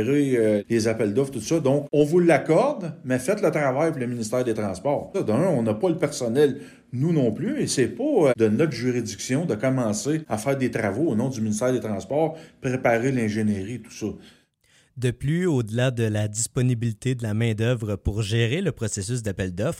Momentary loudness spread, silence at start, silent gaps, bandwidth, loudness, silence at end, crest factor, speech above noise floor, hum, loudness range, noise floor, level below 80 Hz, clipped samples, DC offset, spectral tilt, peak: 7 LU; 0 s; none; 16 kHz; -24 LUFS; 0 s; 16 dB; 38 dB; none; 4 LU; -61 dBFS; -50 dBFS; under 0.1%; under 0.1%; -6 dB/octave; -6 dBFS